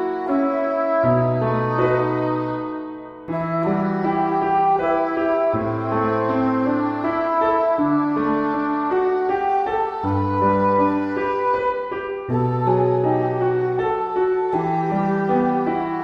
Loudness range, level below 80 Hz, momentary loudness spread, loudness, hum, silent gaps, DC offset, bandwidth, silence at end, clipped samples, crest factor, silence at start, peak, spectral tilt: 1 LU; -52 dBFS; 5 LU; -20 LUFS; none; none; under 0.1%; 6.2 kHz; 0 s; under 0.1%; 14 dB; 0 s; -6 dBFS; -9.5 dB/octave